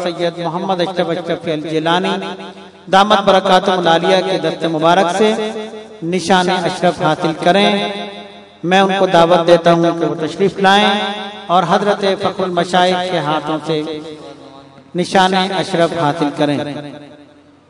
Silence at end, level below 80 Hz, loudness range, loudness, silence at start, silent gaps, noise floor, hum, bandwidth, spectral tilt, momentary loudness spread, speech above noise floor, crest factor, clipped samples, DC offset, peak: 0.45 s; -56 dBFS; 4 LU; -14 LUFS; 0 s; none; -44 dBFS; none; 12 kHz; -5 dB/octave; 15 LU; 30 dB; 14 dB; 0.3%; under 0.1%; 0 dBFS